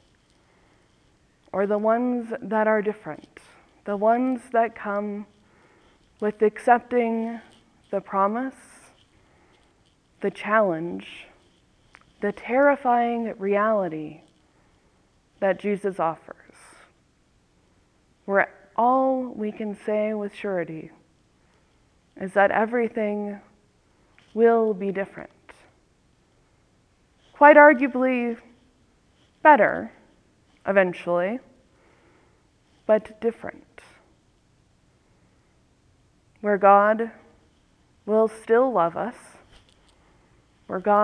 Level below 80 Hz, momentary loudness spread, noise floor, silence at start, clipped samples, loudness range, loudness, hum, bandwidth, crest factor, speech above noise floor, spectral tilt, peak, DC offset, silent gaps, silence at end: -66 dBFS; 18 LU; -63 dBFS; 1.55 s; under 0.1%; 11 LU; -22 LUFS; none; 10.5 kHz; 24 dB; 41 dB; -7 dB/octave; 0 dBFS; under 0.1%; none; 0 s